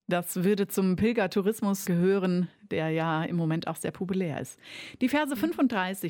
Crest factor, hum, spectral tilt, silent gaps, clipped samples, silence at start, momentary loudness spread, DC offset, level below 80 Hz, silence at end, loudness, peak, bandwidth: 14 dB; none; -6 dB/octave; none; under 0.1%; 0.1 s; 8 LU; under 0.1%; -64 dBFS; 0 s; -28 LUFS; -14 dBFS; 17.5 kHz